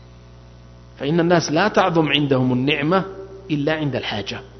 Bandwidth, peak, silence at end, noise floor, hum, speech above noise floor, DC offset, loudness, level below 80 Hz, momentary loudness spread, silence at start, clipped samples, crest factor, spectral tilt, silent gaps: 6.4 kHz; -2 dBFS; 0 s; -43 dBFS; 60 Hz at -45 dBFS; 24 dB; under 0.1%; -19 LUFS; -48 dBFS; 10 LU; 0 s; under 0.1%; 18 dB; -5.5 dB/octave; none